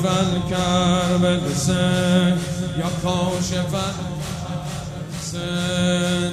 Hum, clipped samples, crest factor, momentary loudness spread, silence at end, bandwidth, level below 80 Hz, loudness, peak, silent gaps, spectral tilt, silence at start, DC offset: none; under 0.1%; 16 dB; 10 LU; 0 s; 14 kHz; -42 dBFS; -21 LUFS; -4 dBFS; none; -5 dB/octave; 0 s; under 0.1%